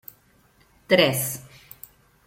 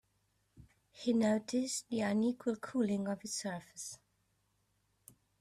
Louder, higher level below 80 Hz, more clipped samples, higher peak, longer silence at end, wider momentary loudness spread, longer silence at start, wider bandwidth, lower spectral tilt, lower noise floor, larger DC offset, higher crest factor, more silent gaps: first, -21 LUFS vs -36 LUFS; first, -62 dBFS vs -74 dBFS; neither; first, -4 dBFS vs -22 dBFS; second, 0.85 s vs 1.45 s; first, 25 LU vs 13 LU; first, 0.9 s vs 0.55 s; first, 16.5 kHz vs 14 kHz; about the same, -3.5 dB/octave vs -4.5 dB/octave; second, -59 dBFS vs -78 dBFS; neither; first, 22 dB vs 16 dB; neither